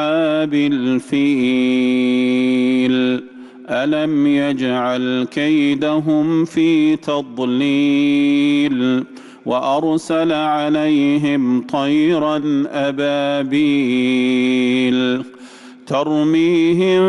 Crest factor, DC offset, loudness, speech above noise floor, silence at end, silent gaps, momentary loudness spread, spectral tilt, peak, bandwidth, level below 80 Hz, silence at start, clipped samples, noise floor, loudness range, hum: 8 dB; under 0.1%; -16 LUFS; 23 dB; 0 s; none; 5 LU; -6 dB/octave; -8 dBFS; 11 kHz; -62 dBFS; 0 s; under 0.1%; -39 dBFS; 1 LU; none